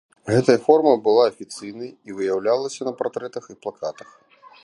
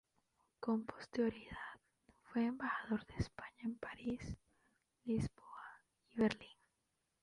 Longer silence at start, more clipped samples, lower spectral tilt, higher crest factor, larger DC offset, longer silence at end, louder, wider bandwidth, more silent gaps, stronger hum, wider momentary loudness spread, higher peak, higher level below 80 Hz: second, 0.25 s vs 0.6 s; neither; about the same, -6 dB/octave vs -7 dB/octave; about the same, 20 dB vs 22 dB; neither; about the same, 0.75 s vs 0.7 s; first, -20 LUFS vs -43 LUFS; about the same, 11.5 kHz vs 11 kHz; neither; neither; about the same, 18 LU vs 17 LU; first, -2 dBFS vs -22 dBFS; about the same, -66 dBFS vs -62 dBFS